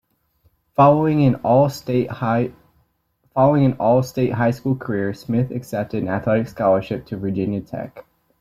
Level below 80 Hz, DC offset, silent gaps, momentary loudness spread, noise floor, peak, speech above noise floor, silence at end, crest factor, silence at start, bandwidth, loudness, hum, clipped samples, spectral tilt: -54 dBFS; under 0.1%; none; 11 LU; -66 dBFS; -2 dBFS; 47 dB; 0.4 s; 18 dB; 0.8 s; 14.5 kHz; -19 LUFS; none; under 0.1%; -8.5 dB/octave